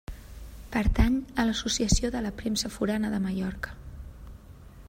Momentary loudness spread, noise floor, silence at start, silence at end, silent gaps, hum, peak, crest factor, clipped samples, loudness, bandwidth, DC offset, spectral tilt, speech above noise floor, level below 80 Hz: 21 LU; -48 dBFS; 0.1 s; 0 s; none; none; -10 dBFS; 20 dB; under 0.1%; -28 LUFS; 16 kHz; under 0.1%; -4.5 dB/octave; 21 dB; -36 dBFS